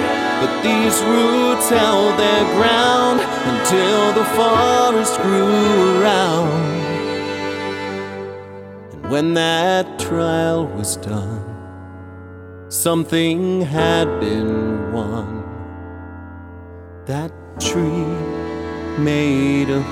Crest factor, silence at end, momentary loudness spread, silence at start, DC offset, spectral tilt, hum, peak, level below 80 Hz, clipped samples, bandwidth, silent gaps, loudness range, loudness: 16 dB; 0 s; 20 LU; 0 s; under 0.1%; -4.5 dB/octave; none; -2 dBFS; -46 dBFS; under 0.1%; 17 kHz; none; 10 LU; -17 LUFS